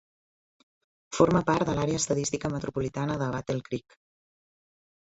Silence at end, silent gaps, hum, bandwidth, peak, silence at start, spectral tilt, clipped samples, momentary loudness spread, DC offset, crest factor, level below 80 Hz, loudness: 1.25 s; none; none; 8.4 kHz; -6 dBFS; 1.1 s; -5.5 dB/octave; under 0.1%; 10 LU; under 0.1%; 22 dB; -54 dBFS; -28 LUFS